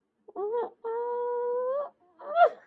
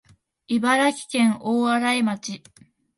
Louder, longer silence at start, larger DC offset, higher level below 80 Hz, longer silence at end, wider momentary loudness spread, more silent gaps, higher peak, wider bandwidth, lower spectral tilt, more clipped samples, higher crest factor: second, -30 LUFS vs -22 LUFS; second, 0.35 s vs 0.5 s; neither; second, -88 dBFS vs -68 dBFS; second, 0.1 s vs 0.6 s; first, 16 LU vs 12 LU; neither; about the same, -10 dBFS vs -8 dBFS; second, 4.6 kHz vs 11.5 kHz; about the same, -5 dB/octave vs -4 dB/octave; neither; about the same, 20 dB vs 16 dB